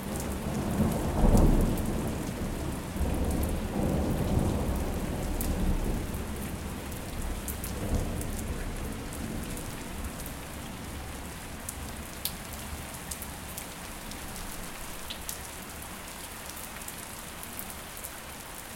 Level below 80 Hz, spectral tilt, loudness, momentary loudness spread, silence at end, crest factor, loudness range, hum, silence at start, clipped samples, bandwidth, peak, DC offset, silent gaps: -36 dBFS; -5 dB/octave; -34 LUFS; 11 LU; 0 s; 22 dB; 9 LU; none; 0 s; under 0.1%; 17 kHz; -8 dBFS; under 0.1%; none